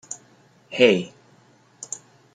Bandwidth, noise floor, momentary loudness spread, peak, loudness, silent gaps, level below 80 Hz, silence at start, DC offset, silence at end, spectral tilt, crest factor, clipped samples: 9.6 kHz; -56 dBFS; 21 LU; -2 dBFS; -20 LUFS; none; -72 dBFS; 0.1 s; under 0.1%; 0.5 s; -3.5 dB/octave; 24 dB; under 0.1%